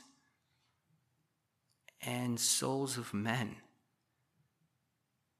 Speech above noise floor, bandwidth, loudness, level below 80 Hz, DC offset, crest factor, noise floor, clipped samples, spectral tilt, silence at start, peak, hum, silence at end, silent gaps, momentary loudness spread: 46 dB; 14.5 kHz; -35 LUFS; -84 dBFS; under 0.1%; 24 dB; -82 dBFS; under 0.1%; -3 dB/octave; 2 s; -18 dBFS; none; 1.8 s; none; 13 LU